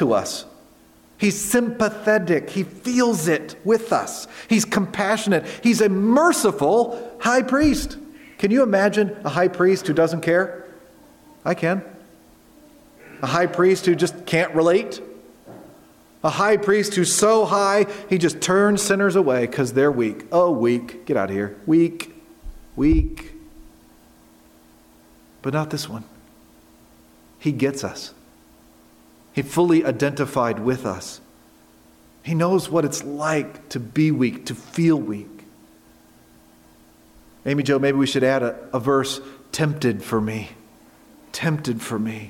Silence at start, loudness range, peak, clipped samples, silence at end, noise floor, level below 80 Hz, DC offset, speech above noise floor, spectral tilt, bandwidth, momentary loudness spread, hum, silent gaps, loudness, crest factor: 0 s; 9 LU; -4 dBFS; under 0.1%; 0 s; -52 dBFS; -42 dBFS; under 0.1%; 32 dB; -5 dB/octave; 17 kHz; 14 LU; none; none; -20 LUFS; 18 dB